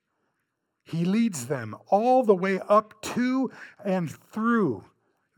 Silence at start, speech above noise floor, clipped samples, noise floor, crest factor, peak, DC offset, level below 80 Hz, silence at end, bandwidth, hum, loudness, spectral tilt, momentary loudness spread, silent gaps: 0.9 s; 54 dB; under 0.1%; -79 dBFS; 18 dB; -8 dBFS; under 0.1%; -74 dBFS; 0.55 s; 18 kHz; none; -25 LUFS; -6.5 dB/octave; 12 LU; none